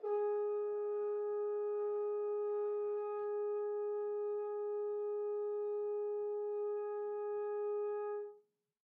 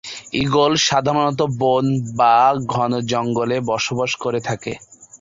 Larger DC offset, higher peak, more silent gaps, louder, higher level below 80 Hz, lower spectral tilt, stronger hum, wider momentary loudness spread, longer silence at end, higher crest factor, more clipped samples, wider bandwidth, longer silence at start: neither; second, -30 dBFS vs -4 dBFS; neither; second, -39 LUFS vs -18 LUFS; second, under -90 dBFS vs -52 dBFS; about the same, -4.5 dB/octave vs -4.5 dB/octave; neither; second, 2 LU vs 9 LU; first, 0.55 s vs 0.05 s; second, 10 dB vs 16 dB; neither; second, 2.6 kHz vs 7.8 kHz; about the same, 0 s vs 0.05 s